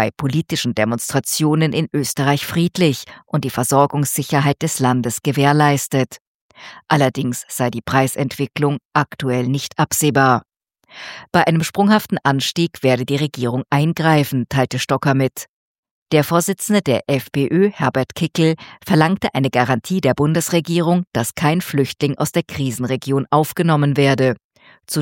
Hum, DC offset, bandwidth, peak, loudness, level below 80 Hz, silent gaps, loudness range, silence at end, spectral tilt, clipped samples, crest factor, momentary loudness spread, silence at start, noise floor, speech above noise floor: none; under 0.1%; 17 kHz; 0 dBFS; -18 LUFS; -56 dBFS; 6.21-6.49 s, 8.85-8.90 s, 15.49-15.83 s, 15.91-16.06 s, 24.44-24.50 s; 2 LU; 0 s; -5 dB/octave; under 0.1%; 18 dB; 7 LU; 0 s; -38 dBFS; 21 dB